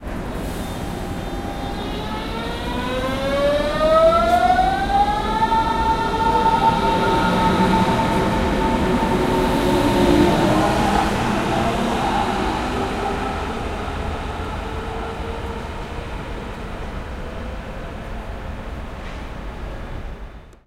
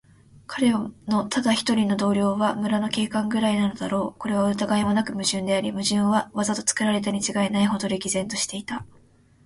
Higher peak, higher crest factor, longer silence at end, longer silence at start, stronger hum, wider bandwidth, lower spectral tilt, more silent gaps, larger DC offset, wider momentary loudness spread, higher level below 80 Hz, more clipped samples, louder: about the same, -4 dBFS vs -6 dBFS; about the same, 16 dB vs 18 dB; second, 0.15 s vs 0.6 s; second, 0 s vs 0.5 s; neither; first, 16 kHz vs 11.5 kHz; first, -6 dB/octave vs -4 dB/octave; neither; neither; first, 16 LU vs 5 LU; first, -30 dBFS vs -58 dBFS; neither; first, -20 LUFS vs -23 LUFS